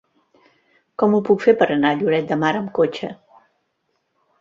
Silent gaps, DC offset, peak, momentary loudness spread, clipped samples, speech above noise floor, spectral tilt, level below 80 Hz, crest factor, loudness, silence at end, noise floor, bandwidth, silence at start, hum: none; under 0.1%; -2 dBFS; 11 LU; under 0.1%; 53 dB; -7 dB/octave; -64 dBFS; 18 dB; -18 LUFS; 1.25 s; -71 dBFS; 7.6 kHz; 1 s; none